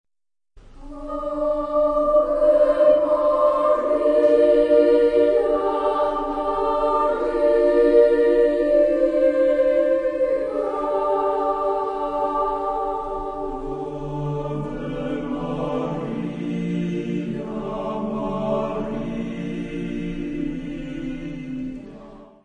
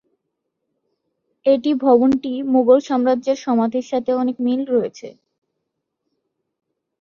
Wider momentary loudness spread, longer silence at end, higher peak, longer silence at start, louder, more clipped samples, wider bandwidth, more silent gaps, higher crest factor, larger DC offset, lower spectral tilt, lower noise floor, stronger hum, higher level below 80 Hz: first, 13 LU vs 7 LU; second, 0.2 s vs 1.9 s; about the same, -4 dBFS vs -2 dBFS; second, 0.55 s vs 1.45 s; second, -21 LUFS vs -18 LUFS; neither; first, 9.4 kHz vs 7.2 kHz; neither; about the same, 16 dB vs 18 dB; neither; first, -8 dB/octave vs -6 dB/octave; first, under -90 dBFS vs -77 dBFS; neither; first, -42 dBFS vs -64 dBFS